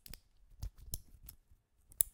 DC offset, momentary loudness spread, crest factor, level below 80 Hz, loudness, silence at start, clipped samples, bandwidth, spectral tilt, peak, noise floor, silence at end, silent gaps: under 0.1%; 16 LU; 40 dB; -54 dBFS; -43 LUFS; 0.05 s; under 0.1%; 18 kHz; -1.5 dB/octave; -4 dBFS; -69 dBFS; 0.05 s; none